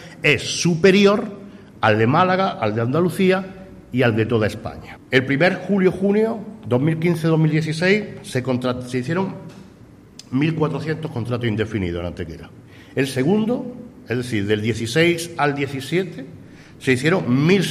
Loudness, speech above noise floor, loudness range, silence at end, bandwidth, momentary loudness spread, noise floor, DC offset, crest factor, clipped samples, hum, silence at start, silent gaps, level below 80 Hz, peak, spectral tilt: -20 LUFS; 26 dB; 6 LU; 0 s; 14 kHz; 14 LU; -45 dBFS; under 0.1%; 18 dB; under 0.1%; none; 0 s; none; -52 dBFS; -2 dBFS; -6 dB/octave